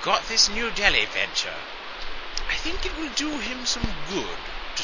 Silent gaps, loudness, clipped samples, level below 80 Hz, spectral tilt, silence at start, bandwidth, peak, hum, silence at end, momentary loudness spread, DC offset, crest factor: none; -24 LUFS; under 0.1%; -40 dBFS; -1.5 dB/octave; 0 s; 7.4 kHz; -2 dBFS; none; 0 s; 15 LU; 0.4%; 24 dB